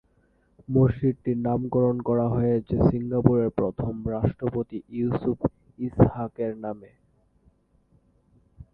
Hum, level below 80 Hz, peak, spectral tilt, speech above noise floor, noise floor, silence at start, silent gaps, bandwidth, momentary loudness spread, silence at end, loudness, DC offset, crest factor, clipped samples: none; -44 dBFS; 0 dBFS; -12.5 dB/octave; 40 dB; -64 dBFS; 0.7 s; none; 4.1 kHz; 9 LU; 0.1 s; -25 LUFS; under 0.1%; 26 dB; under 0.1%